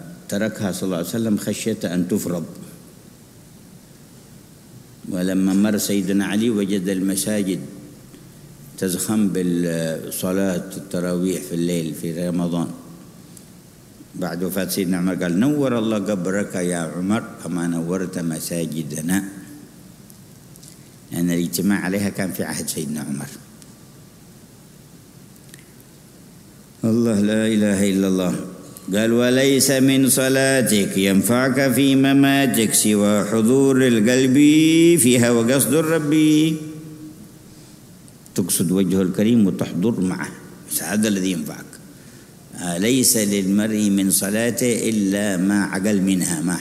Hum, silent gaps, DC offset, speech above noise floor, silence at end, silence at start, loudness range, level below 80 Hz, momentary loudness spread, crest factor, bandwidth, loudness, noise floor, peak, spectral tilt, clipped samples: none; none; under 0.1%; 27 dB; 0 s; 0 s; 11 LU; -58 dBFS; 13 LU; 18 dB; 16 kHz; -19 LUFS; -45 dBFS; -2 dBFS; -4.5 dB/octave; under 0.1%